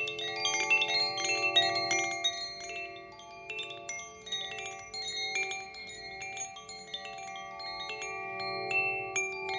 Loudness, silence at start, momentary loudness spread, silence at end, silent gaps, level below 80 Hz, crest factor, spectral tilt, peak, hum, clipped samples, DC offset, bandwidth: -32 LUFS; 0 s; 16 LU; 0 s; none; -70 dBFS; 20 dB; -0.5 dB/octave; -14 dBFS; none; under 0.1%; under 0.1%; 7.8 kHz